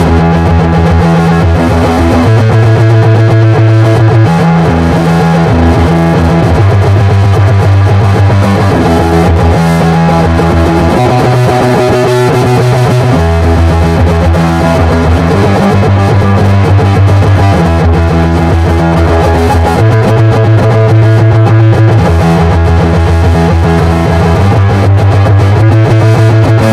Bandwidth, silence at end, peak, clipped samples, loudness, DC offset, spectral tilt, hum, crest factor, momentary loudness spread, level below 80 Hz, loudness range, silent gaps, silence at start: 12.5 kHz; 0 s; 0 dBFS; 2%; -7 LUFS; under 0.1%; -7.5 dB/octave; none; 6 dB; 2 LU; -22 dBFS; 1 LU; none; 0 s